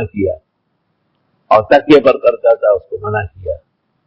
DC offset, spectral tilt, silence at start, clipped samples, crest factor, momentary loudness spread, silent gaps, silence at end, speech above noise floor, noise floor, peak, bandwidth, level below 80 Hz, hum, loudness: under 0.1%; -7.5 dB/octave; 0 s; 0.3%; 14 dB; 17 LU; none; 0.5 s; 54 dB; -66 dBFS; 0 dBFS; 8 kHz; -40 dBFS; none; -12 LUFS